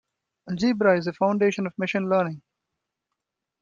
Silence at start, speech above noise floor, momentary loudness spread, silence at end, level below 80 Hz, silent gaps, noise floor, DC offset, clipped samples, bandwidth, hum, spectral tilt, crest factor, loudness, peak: 0.45 s; 60 dB; 9 LU; 1.2 s; -66 dBFS; none; -83 dBFS; under 0.1%; under 0.1%; 7.4 kHz; none; -6.5 dB/octave; 20 dB; -24 LUFS; -6 dBFS